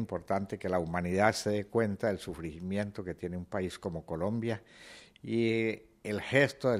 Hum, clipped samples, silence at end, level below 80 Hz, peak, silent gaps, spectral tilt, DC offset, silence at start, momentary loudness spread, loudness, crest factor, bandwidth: none; under 0.1%; 0 s; -60 dBFS; -10 dBFS; none; -6 dB/octave; under 0.1%; 0 s; 13 LU; -33 LUFS; 22 dB; 15.5 kHz